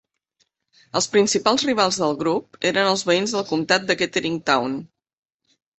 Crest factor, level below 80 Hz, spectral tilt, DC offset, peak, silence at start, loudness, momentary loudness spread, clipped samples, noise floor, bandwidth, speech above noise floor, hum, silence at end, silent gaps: 20 dB; -64 dBFS; -3 dB/octave; under 0.1%; -2 dBFS; 0.95 s; -20 LUFS; 6 LU; under 0.1%; -69 dBFS; 8.6 kHz; 49 dB; none; 0.9 s; none